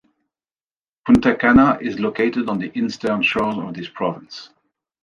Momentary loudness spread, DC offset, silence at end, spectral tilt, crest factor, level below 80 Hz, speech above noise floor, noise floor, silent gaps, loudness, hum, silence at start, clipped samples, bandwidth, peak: 17 LU; under 0.1%; 0.6 s; -6.5 dB/octave; 18 dB; -44 dBFS; over 72 dB; under -90 dBFS; none; -18 LUFS; none; 1.05 s; under 0.1%; 10 kHz; -2 dBFS